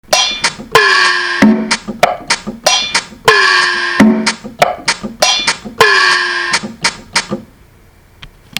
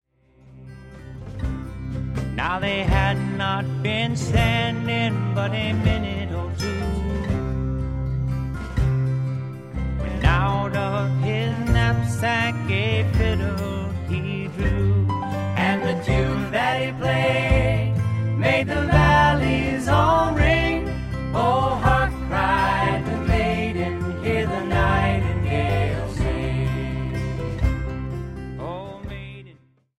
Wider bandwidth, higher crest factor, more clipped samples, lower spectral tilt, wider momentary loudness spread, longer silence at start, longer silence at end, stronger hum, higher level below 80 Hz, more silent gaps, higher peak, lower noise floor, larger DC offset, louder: first, over 20 kHz vs 13 kHz; second, 12 dB vs 18 dB; first, 0.5% vs under 0.1%; second, -2 dB/octave vs -6.5 dB/octave; about the same, 9 LU vs 11 LU; second, 0.1 s vs 0.45 s; second, 0.3 s vs 0.45 s; neither; second, -44 dBFS vs -30 dBFS; neither; first, 0 dBFS vs -4 dBFS; second, -44 dBFS vs -52 dBFS; second, under 0.1% vs 0.2%; first, -11 LUFS vs -22 LUFS